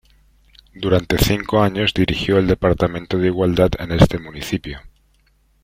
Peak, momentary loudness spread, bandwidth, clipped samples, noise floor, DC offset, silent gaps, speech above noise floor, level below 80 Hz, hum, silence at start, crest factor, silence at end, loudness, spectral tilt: 0 dBFS; 10 LU; 16.5 kHz; under 0.1%; -58 dBFS; under 0.1%; none; 41 dB; -32 dBFS; none; 0.75 s; 18 dB; 0.75 s; -18 LUFS; -6 dB/octave